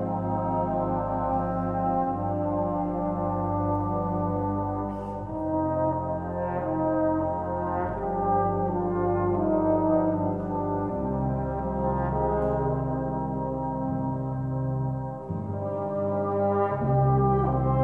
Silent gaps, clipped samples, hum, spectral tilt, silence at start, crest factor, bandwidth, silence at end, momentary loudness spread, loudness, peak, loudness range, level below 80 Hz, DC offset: none; under 0.1%; none; -12 dB/octave; 0 s; 14 dB; 3.3 kHz; 0 s; 6 LU; -27 LUFS; -12 dBFS; 3 LU; -42 dBFS; 0.2%